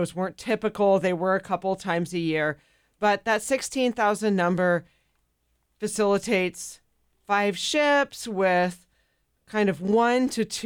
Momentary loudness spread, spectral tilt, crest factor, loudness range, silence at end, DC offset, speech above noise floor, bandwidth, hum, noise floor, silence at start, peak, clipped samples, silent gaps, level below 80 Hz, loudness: 8 LU; -4.5 dB/octave; 14 dB; 2 LU; 0 s; under 0.1%; 47 dB; 19 kHz; none; -72 dBFS; 0 s; -12 dBFS; under 0.1%; none; -62 dBFS; -24 LUFS